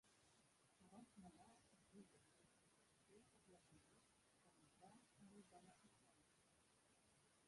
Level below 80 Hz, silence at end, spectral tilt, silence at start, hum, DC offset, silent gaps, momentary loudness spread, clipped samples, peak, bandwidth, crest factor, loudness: under -90 dBFS; 0 s; -4 dB/octave; 0.05 s; none; under 0.1%; none; 3 LU; under 0.1%; -52 dBFS; 11.5 kHz; 20 dB; -68 LUFS